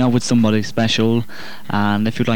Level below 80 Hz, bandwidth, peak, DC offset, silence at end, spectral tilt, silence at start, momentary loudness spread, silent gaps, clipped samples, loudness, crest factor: -50 dBFS; 18 kHz; -4 dBFS; 5%; 0 s; -5.5 dB/octave; 0 s; 9 LU; none; under 0.1%; -17 LUFS; 14 dB